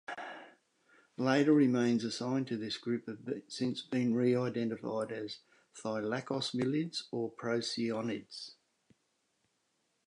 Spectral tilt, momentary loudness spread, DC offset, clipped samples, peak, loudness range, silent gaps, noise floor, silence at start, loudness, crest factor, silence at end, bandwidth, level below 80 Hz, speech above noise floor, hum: -5.5 dB/octave; 16 LU; under 0.1%; under 0.1%; -16 dBFS; 5 LU; none; -79 dBFS; 0.1 s; -34 LUFS; 20 dB; 1.55 s; 11 kHz; -80 dBFS; 46 dB; none